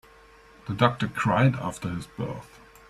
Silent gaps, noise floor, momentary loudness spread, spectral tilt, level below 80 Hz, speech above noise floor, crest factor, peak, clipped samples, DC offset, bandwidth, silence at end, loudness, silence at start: none; -53 dBFS; 14 LU; -6.5 dB/octave; -54 dBFS; 27 dB; 24 dB; -4 dBFS; under 0.1%; under 0.1%; 13 kHz; 0.45 s; -26 LUFS; 0.65 s